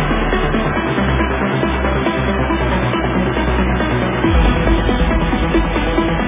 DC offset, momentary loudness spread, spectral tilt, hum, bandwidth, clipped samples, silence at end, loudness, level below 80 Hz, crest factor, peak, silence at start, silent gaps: under 0.1%; 2 LU; -10.5 dB/octave; none; 3.8 kHz; under 0.1%; 0 s; -16 LUFS; -20 dBFS; 14 dB; -2 dBFS; 0 s; none